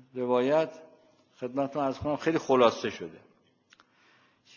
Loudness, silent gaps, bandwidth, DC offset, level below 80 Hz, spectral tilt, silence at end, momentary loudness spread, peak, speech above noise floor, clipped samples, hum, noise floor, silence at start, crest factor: -28 LUFS; none; 7.2 kHz; under 0.1%; -62 dBFS; -5.5 dB/octave; 1.4 s; 14 LU; -8 dBFS; 36 dB; under 0.1%; none; -64 dBFS; 0.15 s; 22 dB